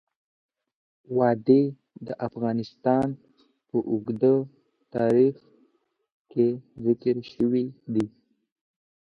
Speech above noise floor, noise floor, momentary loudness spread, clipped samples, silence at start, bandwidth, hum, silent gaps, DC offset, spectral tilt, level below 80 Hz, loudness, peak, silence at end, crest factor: 46 dB; -70 dBFS; 12 LU; under 0.1%; 1.1 s; 6.2 kHz; none; 6.12-6.25 s; under 0.1%; -9.5 dB/octave; -66 dBFS; -25 LUFS; -6 dBFS; 1.1 s; 20 dB